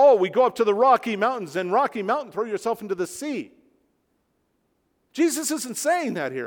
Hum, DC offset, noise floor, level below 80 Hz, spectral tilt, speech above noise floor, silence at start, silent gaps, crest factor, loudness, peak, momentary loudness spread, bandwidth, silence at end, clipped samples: none; under 0.1%; -71 dBFS; -72 dBFS; -4 dB/octave; 47 dB; 0 s; none; 18 dB; -23 LUFS; -4 dBFS; 11 LU; 19.5 kHz; 0 s; under 0.1%